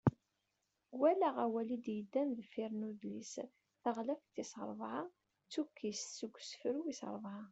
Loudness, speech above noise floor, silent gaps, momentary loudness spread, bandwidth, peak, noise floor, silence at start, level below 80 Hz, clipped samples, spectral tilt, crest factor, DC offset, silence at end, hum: -41 LUFS; 45 dB; none; 12 LU; 8.2 kHz; -18 dBFS; -86 dBFS; 0.05 s; -74 dBFS; under 0.1%; -5.5 dB/octave; 24 dB; under 0.1%; 0 s; none